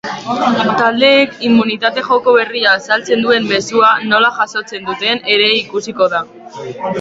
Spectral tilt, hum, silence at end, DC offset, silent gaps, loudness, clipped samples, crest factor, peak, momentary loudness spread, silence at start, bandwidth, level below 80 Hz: -4 dB/octave; none; 0 s; under 0.1%; none; -13 LUFS; under 0.1%; 14 dB; 0 dBFS; 11 LU; 0.05 s; 7.8 kHz; -56 dBFS